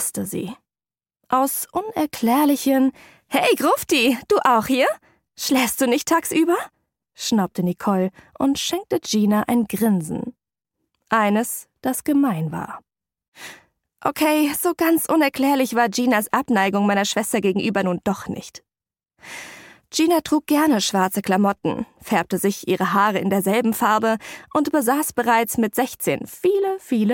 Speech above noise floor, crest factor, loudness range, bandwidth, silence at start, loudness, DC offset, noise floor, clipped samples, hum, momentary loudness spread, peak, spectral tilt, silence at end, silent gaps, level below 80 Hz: over 70 dB; 18 dB; 5 LU; 17 kHz; 0 s; -20 LUFS; under 0.1%; under -90 dBFS; under 0.1%; none; 10 LU; -4 dBFS; -4.5 dB/octave; 0 s; 13.28-13.32 s; -60 dBFS